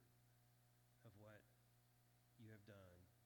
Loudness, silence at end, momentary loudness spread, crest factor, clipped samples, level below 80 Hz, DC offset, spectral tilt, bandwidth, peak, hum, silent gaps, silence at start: -67 LUFS; 0 s; 4 LU; 20 dB; under 0.1%; -88 dBFS; under 0.1%; -6 dB/octave; 19 kHz; -50 dBFS; 60 Hz at -80 dBFS; none; 0 s